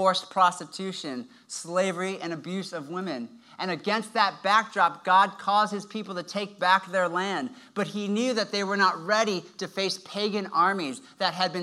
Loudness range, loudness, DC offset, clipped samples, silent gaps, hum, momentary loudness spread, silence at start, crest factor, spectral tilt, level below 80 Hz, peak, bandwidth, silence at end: 5 LU; -26 LUFS; under 0.1%; under 0.1%; none; none; 12 LU; 0 s; 20 dB; -3.5 dB/octave; -86 dBFS; -6 dBFS; 13.5 kHz; 0 s